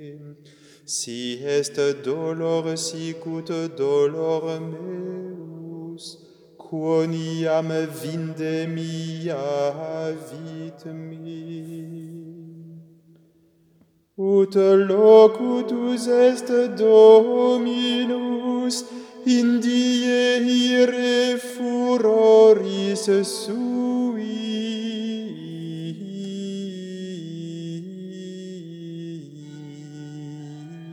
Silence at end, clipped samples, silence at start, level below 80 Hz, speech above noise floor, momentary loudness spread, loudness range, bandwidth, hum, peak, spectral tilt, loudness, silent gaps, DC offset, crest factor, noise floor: 0 s; under 0.1%; 0 s; -80 dBFS; 40 dB; 21 LU; 17 LU; 13.5 kHz; none; -2 dBFS; -5 dB/octave; -20 LUFS; none; under 0.1%; 20 dB; -60 dBFS